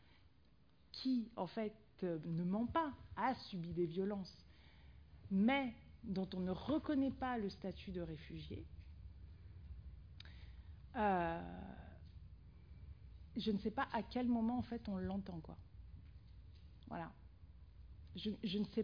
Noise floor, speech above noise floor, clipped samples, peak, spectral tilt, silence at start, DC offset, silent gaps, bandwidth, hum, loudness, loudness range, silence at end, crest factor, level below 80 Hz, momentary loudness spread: -71 dBFS; 30 dB; under 0.1%; -24 dBFS; -5.5 dB/octave; 0.9 s; under 0.1%; none; 5.2 kHz; none; -42 LUFS; 9 LU; 0 s; 18 dB; -60 dBFS; 23 LU